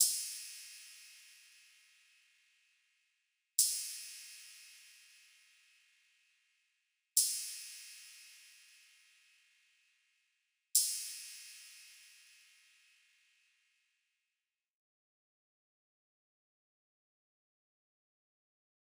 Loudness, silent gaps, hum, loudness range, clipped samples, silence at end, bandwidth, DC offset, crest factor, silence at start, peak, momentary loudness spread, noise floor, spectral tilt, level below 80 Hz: -35 LUFS; none; none; 14 LU; under 0.1%; 6.85 s; over 20 kHz; under 0.1%; 34 dB; 0 s; -12 dBFS; 27 LU; under -90 dBFS; 10 dB/octave; under -90 dBFS